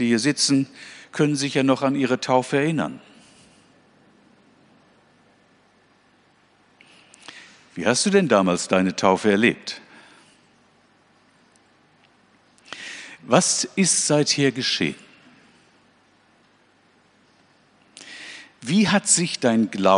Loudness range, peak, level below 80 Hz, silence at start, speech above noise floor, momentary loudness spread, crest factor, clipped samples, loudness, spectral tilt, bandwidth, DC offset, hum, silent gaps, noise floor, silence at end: 10 LU; -2 dBFS; -68 dBFS; 0 s; 39 dB; 21 LU; 22 dB; under 0.1%; -20 LUFS; -3.5 dB/octave; 10.5 kHz; under 0.1%; none; none; -59 dBFS; 0 s